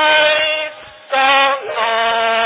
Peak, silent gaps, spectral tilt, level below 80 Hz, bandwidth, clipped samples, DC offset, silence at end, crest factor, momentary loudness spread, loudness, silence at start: -2 dBFS; none; -4.5 dB/octave; -60 dBFS; 4 kHz; under 0.1%; under 0.1%; 0 s; 14 dB; 9 LU; -14 LUFS; 0 s